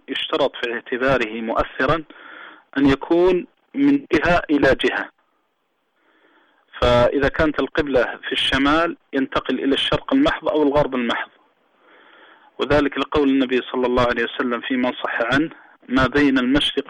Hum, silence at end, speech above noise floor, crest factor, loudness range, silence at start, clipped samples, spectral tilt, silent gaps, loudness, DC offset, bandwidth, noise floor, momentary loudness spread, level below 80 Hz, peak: none; 0.1 s; 51 dB; 12 dB; 2 LU; 0.1 s; under 0.1%; -6 dB/octave; none; -19 LUFS; under 0.1%; 10.5 kHz; -70 dBFS; 8 LU; -38 dBFS; -8 dBFS